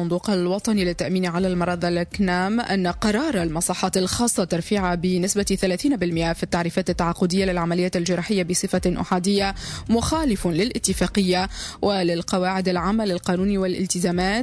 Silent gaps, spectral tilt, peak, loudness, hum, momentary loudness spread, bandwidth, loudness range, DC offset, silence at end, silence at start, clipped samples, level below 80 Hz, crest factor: none; -5 dB/octave; -8 dBFS; -22 LUFS; none; 3 LU; 11 kHz; 1 LU; under 0.1%; 0 s; 0 s; under 0.1%; -40 dBFS; 14 dB